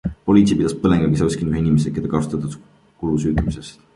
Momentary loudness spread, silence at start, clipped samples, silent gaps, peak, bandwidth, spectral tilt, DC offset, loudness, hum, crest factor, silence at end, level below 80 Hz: 13 LU; 0.05 s; under 0.1%; none; -2 dBFS; 11.5 kHz; -7.5 dB/octave; under 0.1%; -19 LUFS; none; 16 dB; 0.25 s; -36 dBFS